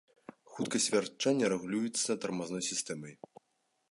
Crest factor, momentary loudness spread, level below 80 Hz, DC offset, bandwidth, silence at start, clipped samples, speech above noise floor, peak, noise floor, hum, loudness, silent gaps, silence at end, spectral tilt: 18 dB; 12 LU; -78 dBFS; under 0.1%; 11.5 kHz; 0.5 s; under 0.1%; 45 dB; -16 dBFS; -78 dBFS; none; -33 LUFS; none; 0.75 s; -3 dB/octave